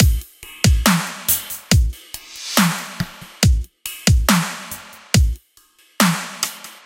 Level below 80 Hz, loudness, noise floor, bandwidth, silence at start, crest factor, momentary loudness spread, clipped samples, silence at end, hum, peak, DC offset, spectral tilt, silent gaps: -24 dBFS; -19 LUFS; -54 dBFS; 17 kHz; 0 s; 18 dB; 15 LU; under 0.1%; 0.1 s; none; 0 dBFS; under 0.1%; -4 dB/octave; none